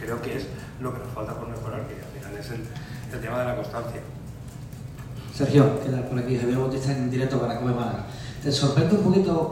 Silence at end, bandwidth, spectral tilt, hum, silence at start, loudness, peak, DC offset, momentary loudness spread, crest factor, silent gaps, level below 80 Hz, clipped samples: 0 s; 16 kHz; -7 dB/octave; none; 0 s; -26 LUFS; -4 dBFS; under 0.1%; 17 LU; 22 dB; none; -46 dBFS; under 0.1%